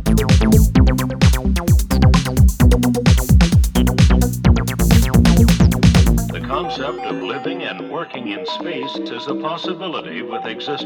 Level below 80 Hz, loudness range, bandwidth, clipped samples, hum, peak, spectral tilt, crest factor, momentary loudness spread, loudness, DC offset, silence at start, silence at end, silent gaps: -20 dBFS; 10 LU; over 20 kHz; under 0.1%; none; 0 dBFS; -6 dB/octave; 14 dB; 13 LU; -16 LUFS; under 0.1%; 0 s; 0 s; none